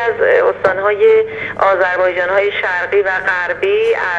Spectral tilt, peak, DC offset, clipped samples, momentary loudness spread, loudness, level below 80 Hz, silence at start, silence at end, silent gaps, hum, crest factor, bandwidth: -5 dB/octave; 0 dBFS; under 0.1%; under 0.1%; 4 LU; -14 LUFS; -52 dBFS; 0 s; 0 s; none; 50 Hz at -45 dBFS; 14 dB; 7.6 kHz